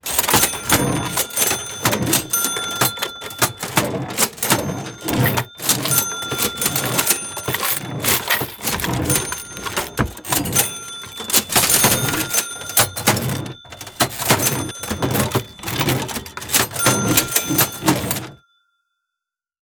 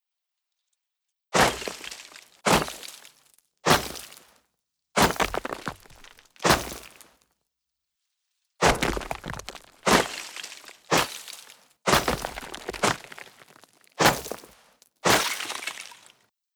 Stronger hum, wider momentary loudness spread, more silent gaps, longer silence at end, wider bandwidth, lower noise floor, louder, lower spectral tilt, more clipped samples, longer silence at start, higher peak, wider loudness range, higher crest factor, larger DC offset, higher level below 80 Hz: neither; second, 10 LU vs 19 LU; neither; first, 1.25 s vs 0.65 s; about the same, over 20 kHz vs over 20 kHz; about the same, -85 dBFS vs -84 dBFS; first, -18 LUFS vs -25 LUFS; about the same, -2.5 dB/octave vs -3 dB/octave; neither; second, 0.05 s vs 1.35 s; first, 0 dBFS vs -4 dBFS; about the same, 3 LU vs 2 LU; about the same, 20 dB vs 24 dB; neither; about the same, -44 dBFS vs -46 dBFS